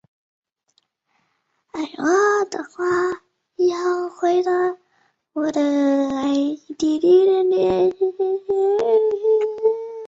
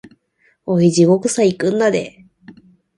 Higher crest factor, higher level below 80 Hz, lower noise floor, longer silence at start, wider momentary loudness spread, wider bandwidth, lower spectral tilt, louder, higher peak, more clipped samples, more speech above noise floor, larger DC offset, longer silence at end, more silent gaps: about the same, 14 dB vs 16 dB; about the same, -62 dBFS vs -60 dBFS; first, -69 dBFS vs -60 dBFS; first, 1.75 s vs 0.65 s; second, 9 LU vs 13 LU; second, 7.8 kHz vs 11.5 kHz; about the same, -5 dB/octave vs -6 dB/octave; second, -20 LUFS vs -15 LUFS; second, -6 dBFS vs 0 dBFS; neither; first, 51 dB vs 46 dB; neither; second, 0 s vs 0.45 s; neither